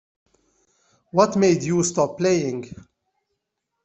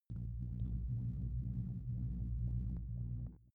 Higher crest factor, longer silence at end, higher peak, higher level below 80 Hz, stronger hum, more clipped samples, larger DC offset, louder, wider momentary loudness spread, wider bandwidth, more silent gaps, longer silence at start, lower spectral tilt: first, 20 dB vs 12 dB; first, 1.1 s vs 0.15 s; first, -2 dBFS vs -28 dBFS; second, -60 dBFS vs -44 dBFS; neither; neither; neither; first, -21 LUFS vs -43 LUFS; first, 12 LU vs 4 LU; first, 8.4 kHz vs 1.5 kHz; neither; first, 1.15 s vs 0.1 s; second, -5.5 dB/octave vs -12 dB/octave